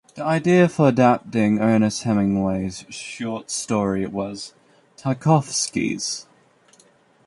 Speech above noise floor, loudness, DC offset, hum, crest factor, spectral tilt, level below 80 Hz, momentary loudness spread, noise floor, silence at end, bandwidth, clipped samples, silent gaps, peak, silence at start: 36 dB; -21 LUFS; under 0.1%; none; 18 dB; -5.5 dB/octave; -54 dBFS; 14 LU; -56 dBFS; 1.05 s; 11.5 kHz; under 0.1%; none; -2 dBFS; 0.15 s